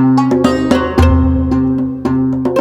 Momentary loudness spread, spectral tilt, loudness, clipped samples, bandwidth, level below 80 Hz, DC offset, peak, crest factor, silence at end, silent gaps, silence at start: 5 LU; -8 dB/octave; -13 LUFS; under 0.1%; 11 kHz; -22 dBFS; under 0.1%; 0 dBFS; 12 dB; 0 s; none; 0 s